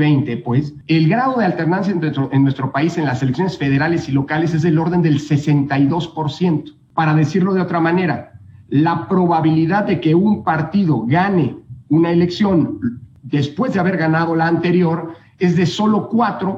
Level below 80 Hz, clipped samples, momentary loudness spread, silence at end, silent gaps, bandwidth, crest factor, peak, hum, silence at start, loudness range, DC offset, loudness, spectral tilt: -52 dBFS; under 0.1%; 6 LU; 0 s; none; 7.8 kHz; 12 dB; -4 dBFS; none; 0 s; 2 LU; under 0.1%; -17 LUFS; -8 dB/octave